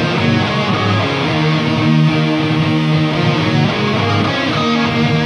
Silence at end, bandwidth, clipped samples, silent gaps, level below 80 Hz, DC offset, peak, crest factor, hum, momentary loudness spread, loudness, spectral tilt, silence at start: 0 s; 10 kHz; under 0.1%; none; -44 dBFS; under 0.1%; -2 dBFS; 12 dB; none; 2 LU; -14 LUFS; -6.5 dB/octave; 0 s